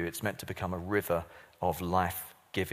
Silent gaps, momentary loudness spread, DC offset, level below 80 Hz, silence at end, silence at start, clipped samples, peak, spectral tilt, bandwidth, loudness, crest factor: none; 7 LU; under 0.1%; -56 dBFS; 0 s; 0 s; under 0.1%; -14 dBFS; -5 dB/octave; 15.5 kHz; -34 LUFS; 20 dB